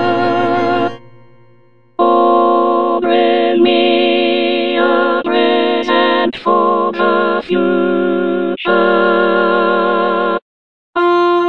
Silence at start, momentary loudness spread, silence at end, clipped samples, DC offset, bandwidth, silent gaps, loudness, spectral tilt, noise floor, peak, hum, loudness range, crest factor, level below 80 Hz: 0 s; 5 LU; 0 s; under 0.1%; 1%; 6 kHz; 10.42-10.93 s; -13 LUFS; -6.5 dB/octave; -50 dBFS; 0 dBFS; none; 2 LU; 12 dB; -58 dBFS